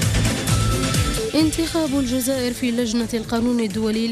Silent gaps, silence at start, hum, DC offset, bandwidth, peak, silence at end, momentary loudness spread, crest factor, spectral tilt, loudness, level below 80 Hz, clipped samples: none; 0 s; none; under 0.1%; 15.5 kHz; -8 dBFS; 0 s; 3 LU; 12 dB; -5 dB/octave; -21 LUFS; -32 dBFS; under 0.1%